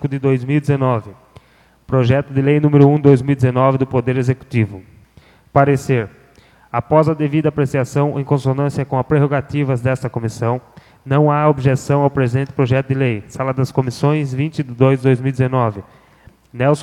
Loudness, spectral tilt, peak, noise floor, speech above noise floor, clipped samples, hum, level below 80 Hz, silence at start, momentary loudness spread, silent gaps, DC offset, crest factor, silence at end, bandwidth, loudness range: -16 LUFS; -8.5 dB/octave; 0 dBFS; -52 dBFS; 36 dB; under 0.1%; none; -48 dBFS; 0 s; 8 LU; none; under 0.1%; 16 dB; 0 s; 11.5 kHz; 3 LU